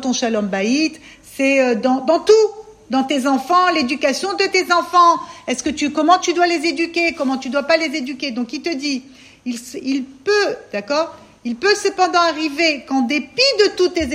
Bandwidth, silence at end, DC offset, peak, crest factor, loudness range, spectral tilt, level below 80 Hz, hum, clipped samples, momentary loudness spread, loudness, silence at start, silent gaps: 15 kHz; 0 s; under 0.1%; 0 dBFS; 16 dB; 6 LU; -3 dB/octave; -54 dBFS; none; under 0.1%; 10 LU; -17 LUFS; 0 s; none